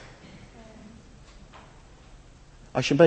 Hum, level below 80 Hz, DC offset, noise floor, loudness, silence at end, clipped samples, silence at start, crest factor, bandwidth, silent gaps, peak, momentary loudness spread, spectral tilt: none; -52 dBFS; under 0.1%; -50 dBFS; -30 LUFS; 0 s; under 0.1%; 2.75 s; 24 dB; 8.6 kHz; none; -4 dBFS; 22 LU; -6 dB/octave